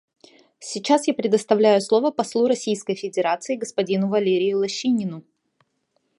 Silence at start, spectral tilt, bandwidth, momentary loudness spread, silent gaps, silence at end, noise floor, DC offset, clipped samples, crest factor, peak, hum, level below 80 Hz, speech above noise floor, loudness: 0.6 s; -5 dB/octave; 11.5 kHz; 9 LU; none; 1 s; -71 dBFS; under 0.1%; under 0.1%; 20 dB; -2 dBFS; none; -72 dBFS; 50 dB; -21 LUFS